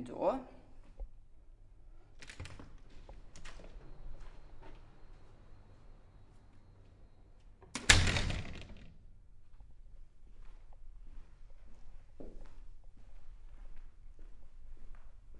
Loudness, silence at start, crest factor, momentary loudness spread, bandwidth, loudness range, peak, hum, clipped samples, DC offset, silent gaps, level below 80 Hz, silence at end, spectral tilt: -32 LUFS; 0 s; 36 dB; 26 LU; 11.5 kHz; 25 LU; -6 dBFS; none; under 0.1%; under 0.1%; none; -48 dBFS; 0 s; -2.5 dB/octave